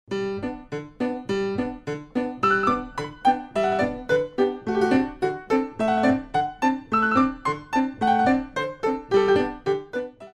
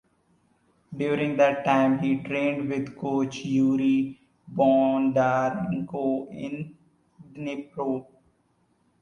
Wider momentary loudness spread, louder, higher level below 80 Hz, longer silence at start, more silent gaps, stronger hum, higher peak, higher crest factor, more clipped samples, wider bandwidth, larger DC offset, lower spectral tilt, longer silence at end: second, 9 LU vs 13 LU; about the same, -24 LUFS vs -25 LUFS; first, -50 dBFS vs -64 dBFS; second, 0.1 s vs 0.9 s; neither; neither; about the same, -6 dBFS vs -8 dBFS; about the same, 16 dB vs 18 dB; neither; first, 11 kHz vs 7 kHz; neither; about the same, -6 dB/octave vs -7 dB/octave; second, 0.05 s vs 1 s